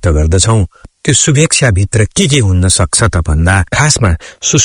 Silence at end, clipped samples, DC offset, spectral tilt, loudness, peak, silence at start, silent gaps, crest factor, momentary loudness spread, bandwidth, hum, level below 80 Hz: 0 s; 0.3%; under 0.1%; -4 dB/octave; -10 LUFS; 0 dBFS; 0.05 s; none; 10 dB; 5 LU; 11 kHz; none; -24 dBFS